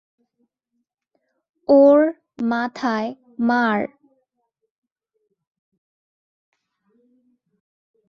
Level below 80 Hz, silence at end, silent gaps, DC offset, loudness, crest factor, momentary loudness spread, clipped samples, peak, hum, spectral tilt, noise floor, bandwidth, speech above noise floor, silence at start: -68 dBFS; 4.25 s; none; under 0.1%; -19 LUFS; 20 dB; 16 LU; under 0.1%; -4 dBFS; none; -6.5 dB/octave; -76 dBFS; 6.8 kHz; 59 dB; 1.7 s